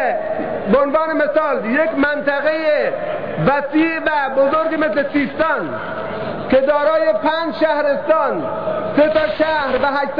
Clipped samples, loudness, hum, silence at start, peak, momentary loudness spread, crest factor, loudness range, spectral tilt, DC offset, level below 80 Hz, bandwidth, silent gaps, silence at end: under 0.1%; -17 LUFS; none; 0 s; -4 dBFS; 7 LU; 12 dB; 1 LU; -8.5 dB/octave; 1%; -48 dBFS; 5.2 kHz; none; 0 s